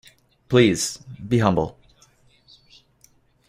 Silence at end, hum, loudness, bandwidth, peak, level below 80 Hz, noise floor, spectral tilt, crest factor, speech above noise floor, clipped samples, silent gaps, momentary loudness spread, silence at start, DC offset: 1.75 s; none; -21 LUFS; 15.5 kHz; -2 dBFS; -52 dBFS; -59 dBFS; -5 dB/octave; 22 dB; 39 dB; under 0.1%; none; 12 LU; 0.5 s; under 0.1%